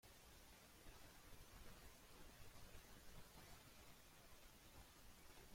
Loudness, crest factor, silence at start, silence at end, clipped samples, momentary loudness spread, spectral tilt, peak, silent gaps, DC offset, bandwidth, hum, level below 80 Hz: -65 LUFS; 16 dB; 0.05 s; 0 s; under 0.1%; 2 LU; -3 dB/octave; -46 dBFS; none; under 0.1%; 16.5 kHz; none; -68 dBFS